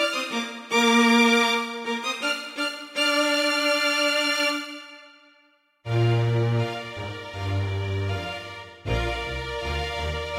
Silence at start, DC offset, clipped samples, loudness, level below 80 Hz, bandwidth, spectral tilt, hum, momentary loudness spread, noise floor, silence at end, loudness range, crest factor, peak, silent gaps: 0 s; under 0.1%; under 0.1%; -24 LUFS; -44 dBFS; 16.5 kHz; -4.5 dB/octave; none; 15 LU; -62 dBFS; 0 s; 8 LU; 18 dB; -6 dBFS; none